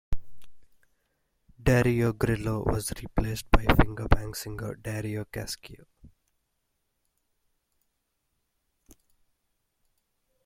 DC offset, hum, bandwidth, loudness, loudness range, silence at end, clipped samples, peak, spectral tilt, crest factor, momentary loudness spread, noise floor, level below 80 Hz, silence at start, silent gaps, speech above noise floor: under 0.1%; none; 16.5 kHz; -28 LUFS; 14 LU; 4.4 s; under 0.1%; -2 dBFS; -6 dB/octave; 28 dB; 14 LU; -78 dBFS; -36 dBFS; 0.1 s; none; 52 dB